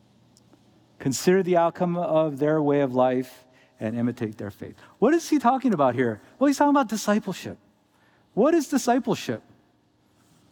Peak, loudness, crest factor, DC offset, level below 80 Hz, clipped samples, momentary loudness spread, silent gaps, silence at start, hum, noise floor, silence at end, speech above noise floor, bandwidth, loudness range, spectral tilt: -6 dBFS; -23 LUFS; 18 dB; under 0.1%; -70 dBFS; under 0.1%; 13 LU; none; 1 s; none; -64 dBFS; 1.15 s; 41 dB; over 20 kHz; 3 LU; -6 dB/octave